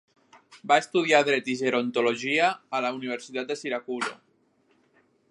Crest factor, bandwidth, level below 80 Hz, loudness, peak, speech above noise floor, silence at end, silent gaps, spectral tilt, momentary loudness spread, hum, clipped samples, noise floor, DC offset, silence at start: 24 dB; 11.5 kHz; -82 dBFS; -25 LUFS; -4 dBFS; 41 dB; 1.15 s; none; -3.5 dB/octave; 11 LU; none; under 0.1%; -66 dBFS; under 0.1%; 0.5 s